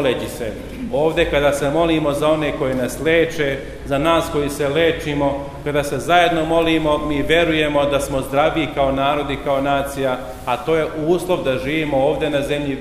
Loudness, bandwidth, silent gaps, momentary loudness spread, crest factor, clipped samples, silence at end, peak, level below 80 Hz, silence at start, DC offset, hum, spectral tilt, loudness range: -18 LUFS; 15.5 kHz; none; 6 LU; 18 dB; under 0.1%; 0 s; 0 dBFS; -36 dBFS; 0 s; under 0.1%; none; -5 dB/octave; 2 LU